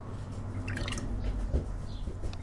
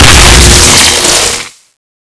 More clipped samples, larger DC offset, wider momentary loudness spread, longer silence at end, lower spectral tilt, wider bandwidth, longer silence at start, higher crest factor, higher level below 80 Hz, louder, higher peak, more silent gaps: second, under 0.1% vs 10%; neither; second, 6 LU vs 9 LU; second, 0 s vs 0.6 s; first, -5.5 dB/octave vs -2 dB/octave; about the same, 11.5 kHz vs 11 kHz; about the same, 0 s vs 0 s; first, 16 dB vs 4 dB; second, -36 dBFS vs -12 dBFS; second, -37 LUFS vs -2 LUFS; second, -18 dBFS vs 0 dBFS; neither